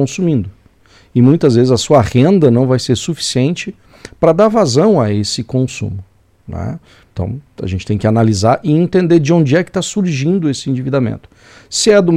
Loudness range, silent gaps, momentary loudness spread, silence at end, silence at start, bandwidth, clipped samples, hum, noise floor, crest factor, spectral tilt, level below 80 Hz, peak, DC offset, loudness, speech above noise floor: 5 LU; none; 14 LU; 0 s; 0 s; 13 kHz; under 0.1%; none; -47 dBFS; 14 dB; -6 dB/octave; -42 dBFS; 0 dBFS; under 0.1%; -13 LUFS; 34 dB